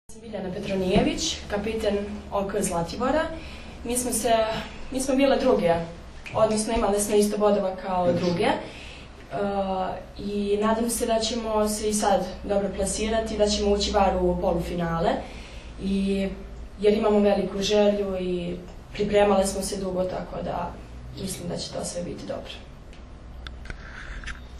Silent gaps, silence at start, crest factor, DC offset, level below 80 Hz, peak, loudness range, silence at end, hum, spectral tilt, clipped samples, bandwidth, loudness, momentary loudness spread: none; 0.1 s; 18 dB; under 0.1%; -40 dBFS; -8 dBFS; 6 LU; 0 s; none; -4.5 dB/octave; under 0.1%; 13.5 kHz; -25 LUFS; 18 LU